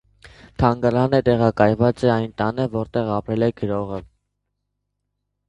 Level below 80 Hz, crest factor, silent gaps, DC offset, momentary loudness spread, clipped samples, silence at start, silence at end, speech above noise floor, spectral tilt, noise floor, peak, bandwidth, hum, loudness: -44 dBFS; 20 dB; none; under 0.1%; 9 LU; under 0.1%; 0.25 s; 1.45 s; 57 dB; -8.5 dB/octave; -77 dBFS; 0 dBFS; 9.8 kHz; 50 Hz at -50 dBFS; -20 LUFS